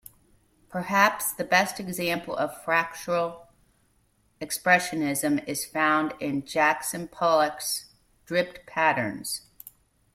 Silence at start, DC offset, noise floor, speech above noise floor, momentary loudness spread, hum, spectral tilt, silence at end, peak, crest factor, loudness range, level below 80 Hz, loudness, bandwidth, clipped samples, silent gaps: 0.7 s; under 0.1%; -67 dBFS; 41 dB; 11 LU; none; -3.5 dB/octave; 0.45 s; -6 dBFS; 22 dB; 3 LU; -64 dBFS; -26 LUFS; 16.5 kHz; under 0.1%; none